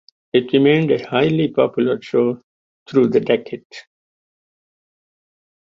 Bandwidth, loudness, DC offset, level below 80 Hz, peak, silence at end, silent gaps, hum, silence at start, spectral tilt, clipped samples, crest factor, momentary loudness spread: 7.4 kHz; -17 LUFS; under 0.1%; -60 dBFS; -2 dBFS; 1.85 s; 2.43-2.86 s, 3.65-3.70 s; none; 0.35 s; -8 dB/octave; under 0.1%; 18 dB; 7 LU